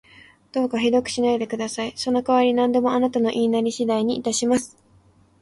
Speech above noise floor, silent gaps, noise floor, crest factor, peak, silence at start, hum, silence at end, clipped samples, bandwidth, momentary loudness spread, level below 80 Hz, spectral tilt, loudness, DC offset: 35 dB; none; -56 dBFS; 16 dB; -6 dBFS; 0.55 s; none; 0.75 s; under 0.1%; 11.5 kHz; 8 LU; -60 dBFS; -4 dB/octave; -22 LUFS; under 0.1%